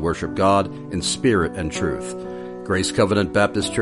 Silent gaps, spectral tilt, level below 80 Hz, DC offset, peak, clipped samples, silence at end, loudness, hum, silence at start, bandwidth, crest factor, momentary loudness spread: none; -4.5 dB/octave; -42 dBFS; under 0.1%; -4 dBFS; under 0.1%; 0 s; -21 LUFS; none; 0 s; 11.5 kHz; 18 dB; 12 LU